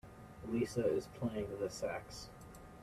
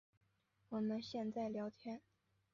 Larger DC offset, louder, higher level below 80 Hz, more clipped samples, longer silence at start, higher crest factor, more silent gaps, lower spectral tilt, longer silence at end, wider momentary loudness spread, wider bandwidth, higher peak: neither; first, -40 LUFS vs -45 LUFS; first, -62 dBFS vs -82 dBFS; neither; second, 0.05 s vs 0.7 s; about the same, 18 dB vs 14 dB; neither; about the same, -6 dB/octave vs -5.5 dB/octave; second, 0 s vs 0.55 s; first, 18 LU vs 10 LU; first, 15 kHz vs 7.2 kHz; first, -22 dBFS vs -32 dBFS